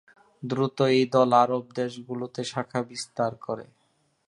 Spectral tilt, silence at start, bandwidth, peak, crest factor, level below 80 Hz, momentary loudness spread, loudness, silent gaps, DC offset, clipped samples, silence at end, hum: -5.5 dB/octave; 0.4 s; 11.5 kHz; -6 dBFS; 20 dB; -70 dBFS; 15 LU; -26 LUFS; none; under 0.1%; under 0.1%; 0.65 s; none